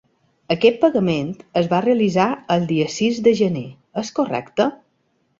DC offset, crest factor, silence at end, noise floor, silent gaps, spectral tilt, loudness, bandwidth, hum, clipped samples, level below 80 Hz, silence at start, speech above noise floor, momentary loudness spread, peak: under 0.1%; 18 dB; 0.65 s; -66 dBFS; none; -6 dB/octave; -19 LUFS; 7.8 kHz; none; under 0.1%; -58 dBFS; 0.5 s; 48 dB; 8 LU; -2 dBFS